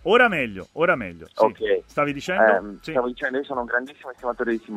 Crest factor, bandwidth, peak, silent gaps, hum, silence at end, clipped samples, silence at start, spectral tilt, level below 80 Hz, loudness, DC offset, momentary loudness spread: 20 dB; 13 kHz; -4 dBFS; none; none; 0 s; under 0.1%; 0.05 s; -5.5 dB/octave; -54 dBFS; -23 LUFS; under 0.1%; 10 LU